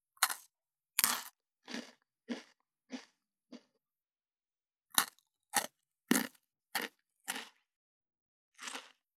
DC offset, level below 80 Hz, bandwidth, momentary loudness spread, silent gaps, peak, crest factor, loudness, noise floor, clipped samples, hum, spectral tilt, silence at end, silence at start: under 0.1%; under -90 dBFS; 19.5 kHz; 20 LU; 7.76-8.01 s, 8.21-8.52 s; -8 dBFS; 34 dB; -37 LUFS; under -90 dBFS; under 0.1%; none; -1 dB/octave; 0.3 s; 0.2 s